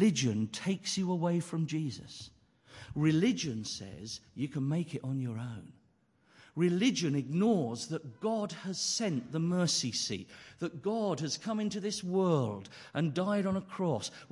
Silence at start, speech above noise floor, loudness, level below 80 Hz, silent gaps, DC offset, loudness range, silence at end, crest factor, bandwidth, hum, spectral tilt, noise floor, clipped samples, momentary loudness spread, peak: 0 s; 37 dB; -33 LUFS; -70 dBFS; none; under 0.1%; 3 LU; 0.05 s; 18 dB; 11.5 kHz; none; -5 dB/octave; -70 dBFS; under 0.1%; 13 LU; -16 dBFS